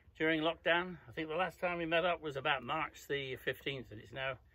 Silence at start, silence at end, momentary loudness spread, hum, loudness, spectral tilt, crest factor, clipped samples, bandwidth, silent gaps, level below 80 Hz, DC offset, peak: 0.05 s; 0.2 s; 9 LU; none; -36 LUFS; -5 dB/octave; 22 dB; under 0.1%; 16 kHz; none; -64 dBFS; under 0.1%; -16 dBFS